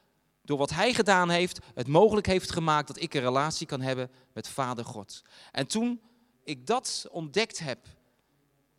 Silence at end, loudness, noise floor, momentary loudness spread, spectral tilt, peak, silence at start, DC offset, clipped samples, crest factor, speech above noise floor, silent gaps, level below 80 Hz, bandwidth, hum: 1.05 s; -28 LUFS; -70 dBFS; 17 LU; -4.5 dB/octave; -8 dBFS; 0.5 s; under 0.1%; under 0.1%; 22 dB; 42 dB; none; -56 dBFS; 15 kHz; none